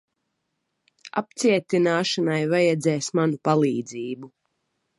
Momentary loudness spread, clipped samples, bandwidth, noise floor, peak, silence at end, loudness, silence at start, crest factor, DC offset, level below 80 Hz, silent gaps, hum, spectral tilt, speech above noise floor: 11 LU; under 0.1%; 11.5 kHz; -77 dBFS; -6 dBFS; 0.7 s; -23 LUFS; 1.05 s; 18 dB; under 0.1%; -74 dBFS; none; none; -5 dB/octave; 55 dB